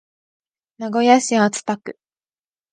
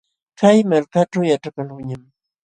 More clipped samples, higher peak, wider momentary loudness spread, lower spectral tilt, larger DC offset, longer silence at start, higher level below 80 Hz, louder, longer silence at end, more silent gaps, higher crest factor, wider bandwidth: neither; about the same, 0 dBFS vs 0 dBFS; about the same, 16 LU vs 17 LU; second, -4 dB/octave vs -6.5 dB/octave; neither; first, 0.8 s vs 0.4 s; second, -74 dBFS vs -60 dBFS; about the same, -18 LUFS vs -17 LUFS; first, 0.8 s vs 0.45 s; neither; about the same, 20 dB vs 18 dB; about the same, 10 kHz vs 9.6 kHz